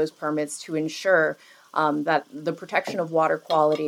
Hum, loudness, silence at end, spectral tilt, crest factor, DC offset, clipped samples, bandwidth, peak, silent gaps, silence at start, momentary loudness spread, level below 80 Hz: none; -24 LUFS; 0 s; -4.5 dB/octave; 18 dB; under 0.1%; under 0.1%; 16 kHz; -6 dBFS; none; 0 s; 9 LU; -84 dBFS